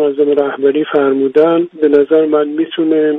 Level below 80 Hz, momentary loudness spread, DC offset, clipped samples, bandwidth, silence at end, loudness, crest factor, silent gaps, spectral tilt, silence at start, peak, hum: -60 dBFS; 4 LU; under 0.1%; under 0.1%; 3.9 kHz; 0 s; -12 LUFS; 12 dB; none; -8 dB/octave; 0 s; 0 dBFS; none